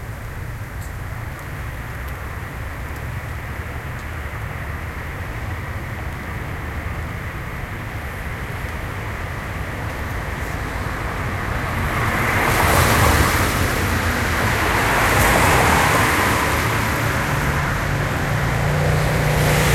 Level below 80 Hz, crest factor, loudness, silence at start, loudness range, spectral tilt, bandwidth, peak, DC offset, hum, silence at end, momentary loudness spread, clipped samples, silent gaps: -30 dBFS; 18 dB; -21 LUFS; 0 s; 13 LU; -4.5 dB/octave; 16.5 kHz; -2 dBFS; under 0.1%; none; 0 s; 15 LU; under 0.1%; none